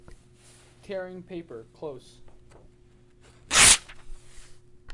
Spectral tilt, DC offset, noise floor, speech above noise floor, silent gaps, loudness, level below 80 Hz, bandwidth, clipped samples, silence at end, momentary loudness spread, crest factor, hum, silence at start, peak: 0 dB/octave; under 0.1%; -56 dBFS; 18 dB; none; -17 LUFS; -48 dBFS; 11.5 kHz; under 0.1%; 0 s; 25 LU; 26 dB; none; 0.9 s; -4 dBFS